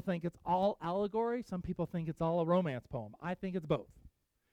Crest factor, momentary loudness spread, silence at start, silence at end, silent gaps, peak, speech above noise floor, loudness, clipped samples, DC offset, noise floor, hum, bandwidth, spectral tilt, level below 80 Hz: 16 dB; 9 LU; 0 s; 0.45 s; none; -20 dBFS; 28 dB; -36 LUFS; under 0.1%; under 0.1%; -64 dBFS; none; 9 kHz; -8.5 dB/octave; -62 dBFS